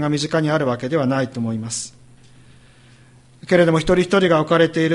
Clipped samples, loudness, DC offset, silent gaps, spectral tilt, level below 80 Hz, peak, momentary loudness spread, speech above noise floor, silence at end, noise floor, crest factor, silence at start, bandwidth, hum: under 0.1%; -18 LUFS; under 0.1%; none; -5.5 dB/octave; -46 dBFS; -2 dBFS; 10 LU; 31 dB; 0 s; -48 dBFS; 18 dB; 0 s; 11.5 kHz; none